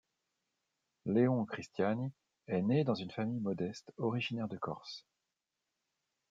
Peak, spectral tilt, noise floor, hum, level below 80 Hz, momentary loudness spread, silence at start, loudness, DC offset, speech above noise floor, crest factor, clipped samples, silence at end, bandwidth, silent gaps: -18 dBFS; -7.5 dB/octave; -89 dBFS; none; -80 dBFS; 12 LU; 1.05 s; -36 LUFS; under 0.1%; 54 dB; 20 dB; under 0.1%; 1.3 s; 7.8 kHz; none